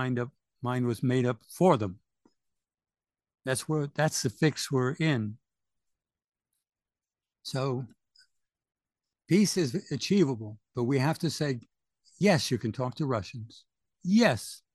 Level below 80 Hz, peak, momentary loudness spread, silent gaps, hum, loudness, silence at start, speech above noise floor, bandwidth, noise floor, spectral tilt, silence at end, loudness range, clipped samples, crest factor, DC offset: -68 dBFS; -8 dBFS; 14 LU; none; none; -29 LUFS; 0 s; over 62 dB; 12.5 kHz; under -90 dBFS; -5.5 dB/octave; 0.2 s; 9 LU; under 0.1%; 22 dB; under 0.1%